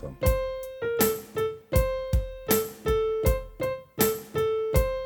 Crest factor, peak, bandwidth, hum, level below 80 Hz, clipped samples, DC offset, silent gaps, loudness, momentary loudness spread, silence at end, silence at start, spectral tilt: 20 dB; -8 dBFS; 19 kHz; none; -34 dBFS; under 0.1%; under 0.1%; none; -27 LUFS; 6 LU; 0 s; 0 s; -5 dB/octave